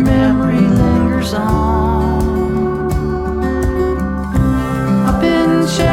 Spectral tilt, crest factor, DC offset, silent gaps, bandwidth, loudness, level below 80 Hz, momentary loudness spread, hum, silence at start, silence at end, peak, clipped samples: -7 dB/octave; 12 dB; under 0.1%; none; 16.5 kHz; -15 LUFS; -22 dBFS; 6 LU; none; 0 s; 0 s; -2 dBFS; under 0.1%